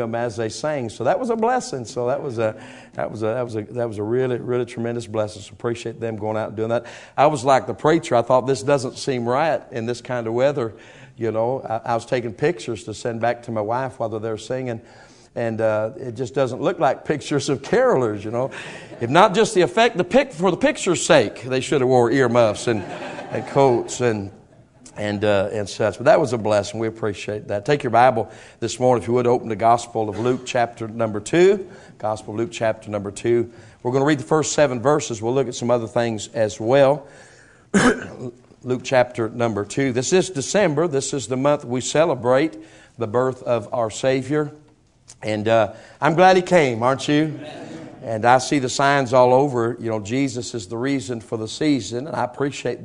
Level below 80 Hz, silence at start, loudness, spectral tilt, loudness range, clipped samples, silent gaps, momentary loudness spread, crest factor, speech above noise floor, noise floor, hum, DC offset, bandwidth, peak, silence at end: -56 dBFS; 0 s; -21 LUFS; -5 dB/octave; 6 LU; under 0.1%; none; 12 LU; 20 dB; 28 dB; -48 dBFS; none; under 0.1%; 11 kHz; 0 dBFS; 0 s